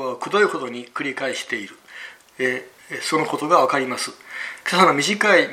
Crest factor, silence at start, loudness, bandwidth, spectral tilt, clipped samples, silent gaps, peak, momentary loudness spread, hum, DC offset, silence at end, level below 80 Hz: 20 dB; 0 s; -21 LUFS; 16 kHz; -3.5 dB/octave; under 0.1%; none; 0 dBFS; 17 LU; none; under 0.1%; 0 s; -72 dBFS